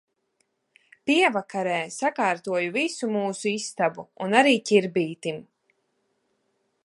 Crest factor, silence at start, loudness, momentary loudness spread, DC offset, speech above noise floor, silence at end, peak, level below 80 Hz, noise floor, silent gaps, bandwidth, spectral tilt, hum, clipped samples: 22 dB; 1.05 s; -24 LUFS; 12 LU; under 0.1%; 49 dB; 1.45 s; -4 dBFS; -78 dBFS; -73 dBFS; none; 11.5 kHz; -4 dB/octave; none; under 0.1%